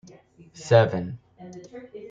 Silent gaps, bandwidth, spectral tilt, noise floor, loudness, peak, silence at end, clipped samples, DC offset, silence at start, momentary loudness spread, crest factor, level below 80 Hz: none; 7.8 kHz; -6.5 dB/octave; -51 dBFS; -21 LUFS; -2 dBFS; 0 s; under 0.1%; under 0.1%; 0.6 s; 24 LU; 24 dB; -64 dBFS